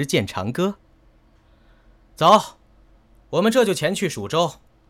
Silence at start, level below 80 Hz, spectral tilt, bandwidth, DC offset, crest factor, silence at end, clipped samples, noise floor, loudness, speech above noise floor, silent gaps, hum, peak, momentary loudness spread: 0 s; -56 dBFS; -4.5 dB/octave; 16.5 kHz; under 0.1%; 20 dB; 0.35 s; under 0.1%; -55 dBFS; -20 LUFS; 35 dB; none; none; -4 dBFS; 11 LU